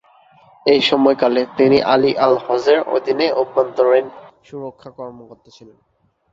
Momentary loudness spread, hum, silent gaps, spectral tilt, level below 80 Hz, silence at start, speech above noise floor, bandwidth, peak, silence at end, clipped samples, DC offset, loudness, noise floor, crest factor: 20 LU; none; none; -5.5 dB/octave; -60 dBFS; 0.65 s; 34 dB; 7.6 kHz; -2 dBFS; 1 s; under 0.1%; under 0.1%; -15 LUFS; -50 dBFS; 16 dB